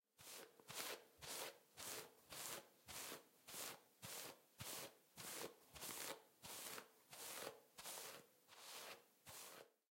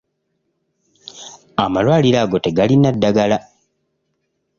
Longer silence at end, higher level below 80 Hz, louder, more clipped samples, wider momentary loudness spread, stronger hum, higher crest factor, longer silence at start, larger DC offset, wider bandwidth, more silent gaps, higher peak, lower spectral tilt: second, 0.2 s vs 1.2 s; second, -86 dBFS vs -50 dBFS; second, -54 LUFS vs -16 LUFS; neither; second, 8 LU vs 21 LU; neither; first, 26 dB vs 16 dB; second, 0.2 s vs 1.15 s; neither; first, 16.5 kHz vs 7.4 kHz; neither; second, -30 dBFS vs -2 dBFS; second, -1 dB/octave vs -6.5 dB/octave